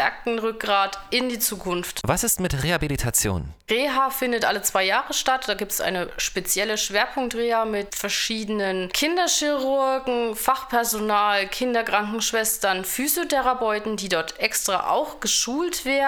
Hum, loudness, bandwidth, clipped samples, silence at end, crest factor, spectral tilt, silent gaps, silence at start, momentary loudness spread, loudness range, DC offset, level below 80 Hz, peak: none; -23 LUFS; over 20 kHz; under 0.1%; 0 s; 18 dB; -2.5 dB/octave; none; 0 s; 4 LU; 1 LU; under 0.1%; -44 dBFS; -4 dBFS